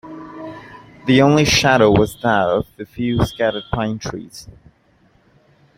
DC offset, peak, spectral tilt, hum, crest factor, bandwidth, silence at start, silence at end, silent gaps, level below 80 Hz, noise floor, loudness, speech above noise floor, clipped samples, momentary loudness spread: under 0.1%; 0 dBFS; -5 dB/octave; none; 18 dB; 16.5 kHz; 0.05 s; 1.35 s; none; -40 dBFS; -56 dBFS; -16 LUFS; 39 dB; under 0.1%; 22 LU